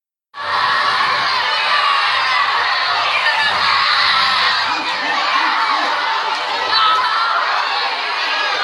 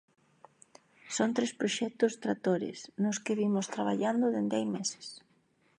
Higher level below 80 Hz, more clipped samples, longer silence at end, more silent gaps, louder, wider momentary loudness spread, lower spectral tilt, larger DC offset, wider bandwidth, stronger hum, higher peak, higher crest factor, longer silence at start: first, -64 dBFS vs -82 dBFS; neither; second, 0 s vs 0.6 s; neither; first, -15 LUFS vs -32 LUFS; second, 5 LU vs 8 LU; second, -0.5 dB/octave vs -4.5 dB/octave; neither; first, 13.5 kHz vs 10.5 kHz; neither; first, -2 dBFS vs -14 dBFS; second, 14 dB vs 20 dB; second, 0.35 s vs 1.05 s